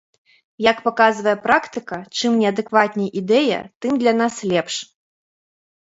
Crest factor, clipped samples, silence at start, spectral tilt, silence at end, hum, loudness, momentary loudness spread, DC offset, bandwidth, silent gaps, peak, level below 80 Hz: 20 dB; under 0.1%; 0.6 s; -4.5 dB/octave; 1 s; none; -19 LUFS; 10 LU; under 0.1%; 8 kHz; 3.75-3.80 s; 0 dBFS; -64 dBFS